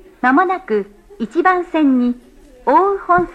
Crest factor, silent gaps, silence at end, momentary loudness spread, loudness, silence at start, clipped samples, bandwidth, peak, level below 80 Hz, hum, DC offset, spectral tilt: 16 dB; none; 0 s; 11 LU; -16 LUFS; 0.25 s; under 0.1%; 8.8 kHz; 0 dBFS; -48 dBFS; none; under 0.1%; -7 dB/octave